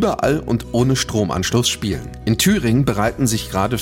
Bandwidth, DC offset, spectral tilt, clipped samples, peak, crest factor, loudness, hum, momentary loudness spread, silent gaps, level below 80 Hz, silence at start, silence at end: 17 kHz; under 0.1%; -4.5 dB/octave; under 0.1%; -6 dBFS; 12 dB; -18 LUFS; none; 6 LU; none; -36 dBFS; 0 s; 0 s